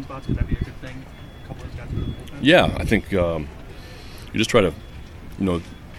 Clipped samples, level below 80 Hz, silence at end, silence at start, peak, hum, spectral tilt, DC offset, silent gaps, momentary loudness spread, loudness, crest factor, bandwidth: under 0.1%; -34 dBFS; 0 s; 0 s; 0 dBFS; none; -5.5 dB/octave; under 0.1%; none; 23 LU; -22 LUFS; 22 dB; 16 kHz